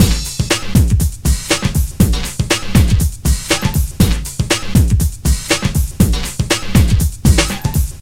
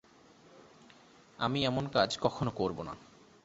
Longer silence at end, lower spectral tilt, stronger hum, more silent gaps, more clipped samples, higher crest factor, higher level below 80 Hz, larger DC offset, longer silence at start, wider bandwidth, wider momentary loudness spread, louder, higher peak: second, 0 s vs 0.4 s; about the same, -4.5 dB/octave vs -4 dB/octave; neither; neither; neither; second, 14 dB vs 24 dB; first, -18 dBFS vs -60 dBFS; first, 1% vs under 0.1%; second, 0 s vs 0.55 s; first, 16.5 kHz vs 8 kHz; second, 5 LU vs 13 LU; first, -15 LUFS vs -32 LUFS; first, 0 dBFS vs -12 dBFS